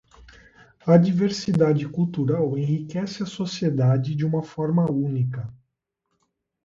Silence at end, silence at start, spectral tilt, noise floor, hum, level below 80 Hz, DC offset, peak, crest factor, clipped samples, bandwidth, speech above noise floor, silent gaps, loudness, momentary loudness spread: 1.1 s; 0.2 s; -8 dB/octave; -78 dBFS; none; -58 dBFS; under 0.1%; -4 dBFS; 20 dB; under 0.1%; 7.6 kHz; 56 dB; none; -23 LUFS; 11 LU